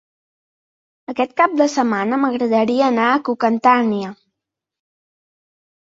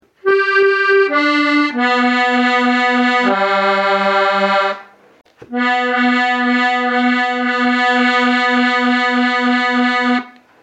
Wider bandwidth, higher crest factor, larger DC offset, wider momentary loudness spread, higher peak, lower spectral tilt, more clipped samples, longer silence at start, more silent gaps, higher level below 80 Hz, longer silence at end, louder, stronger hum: second, 7.8 kHz vs 8.6 kHz; first, 18 dB vs 12 dB; neither; first, 8 LU vs 3 LU; about the same, -2 dBFS vs -2 dBFS; about the same, -5 dB/octave vs -4 dB/octave; neither; first, 1.1 s vs 0.25 s; neither; about the same, -66 dBFS vs -70 dBFS; first, 1.8 s vs 0.3 s; second, -17 LUFS vs -14 LUFS; neither